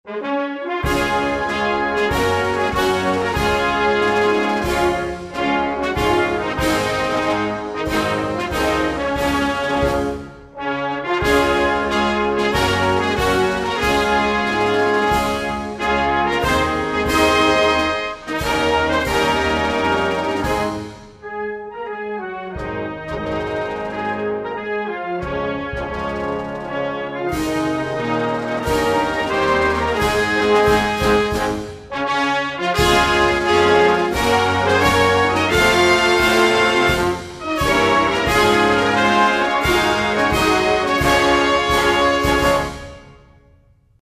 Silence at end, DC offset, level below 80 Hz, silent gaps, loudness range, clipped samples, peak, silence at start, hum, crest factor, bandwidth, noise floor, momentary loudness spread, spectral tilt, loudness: 0.9 s; under 0.1%; -36 dBFS; none; 9 LU; under 0.1%; -2 dBFS; 0.05 s; none; 16 dB; 15 kHz; -53 dBFS; 10 LU; -4.5 dB/octave; -18 LUFS